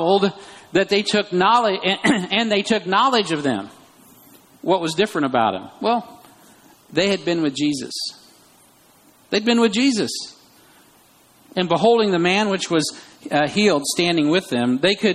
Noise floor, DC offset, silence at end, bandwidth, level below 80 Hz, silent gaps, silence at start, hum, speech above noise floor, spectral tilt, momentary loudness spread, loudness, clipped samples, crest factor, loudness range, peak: -53 dBFS; under 0.1%; 0 s; 15 kHz; -62 dBFS; none; 0 s; none; 34 dB; -4 dB/octave; 10 LU; -19 LUFS; under 0.1%; 16 dB; 5 LU; -4 dBFS